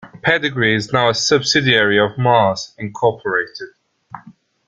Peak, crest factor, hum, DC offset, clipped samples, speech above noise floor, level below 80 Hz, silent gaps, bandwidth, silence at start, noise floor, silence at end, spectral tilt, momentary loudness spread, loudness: 0 dBFS; 16 dB; none; under 0.1%; under 0.1%; 29 dB; -54 dBFS; none; 9.4 kHz; 0 s; -45 dBFS; 0.35 s; -4 dB/octave; 13 LU; -16 LUFS